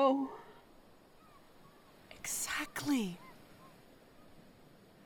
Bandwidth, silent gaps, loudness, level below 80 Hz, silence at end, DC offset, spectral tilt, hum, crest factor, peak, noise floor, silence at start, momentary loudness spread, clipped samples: 19.5 kHz; none; -37 LUFS; -68 dBFS; 0.55 s; under 0.1%; -3.5 dB/octave; none; 20 dB; -20 dBFS; -61 dBFS; 0 s; 26 LU; under 0.1%